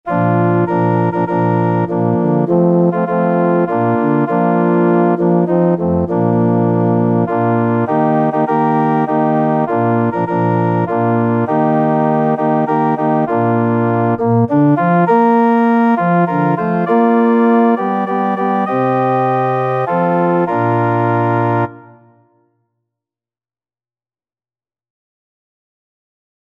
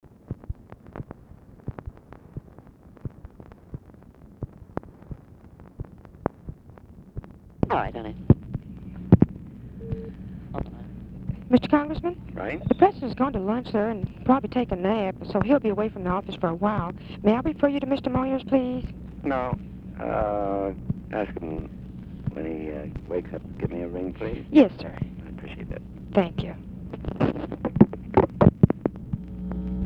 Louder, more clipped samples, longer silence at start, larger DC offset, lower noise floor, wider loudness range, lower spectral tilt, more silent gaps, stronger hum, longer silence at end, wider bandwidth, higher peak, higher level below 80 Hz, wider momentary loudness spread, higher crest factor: first, -14 LUFS vs -26 LUFS; neither; second, 0.05 s vs 0.3 s; neither; first, under -90 dBFS vs -49 dBFS; second, 3 LU vs 18 LU; about the same, -10.5 dB/octave vs -10 dB/octave; neither; neither; first, 4.75 s vs 0 s; second, 4.1 kHz vs 5.8 kHz; about the same, 0 dBFS vs 0 dBFS; second, -54 dBFS vs -42 dBFS; second, 4 LU vs 21 LU; second, 14 dB vs 26 dB